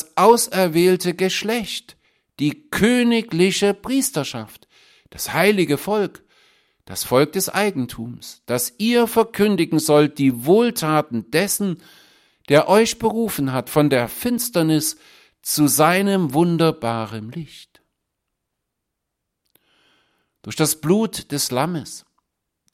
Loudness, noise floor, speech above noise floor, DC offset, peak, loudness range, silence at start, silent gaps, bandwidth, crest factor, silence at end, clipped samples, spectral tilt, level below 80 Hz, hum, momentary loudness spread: -19 LUFS; -79 dBFS; 60 dB; under 0.1%; -2 dBFS; 6 LU; 0 s; none; 16.5 kHz; 18 dB; 0.75 s; under 0.1%; -4.5 dB/octave; -56 dBFS; none; 14 LU